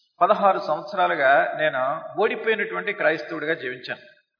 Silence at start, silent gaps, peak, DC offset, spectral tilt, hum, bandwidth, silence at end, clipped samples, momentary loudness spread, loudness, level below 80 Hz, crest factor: 0.2 s; none; -4 dBFS; under 0.1%; -6 dB/octave; none; 5.4 kHz; 0.4 s; under 0.1%; 10 LU; -22 LUFS; -82 dBFS; 18 dB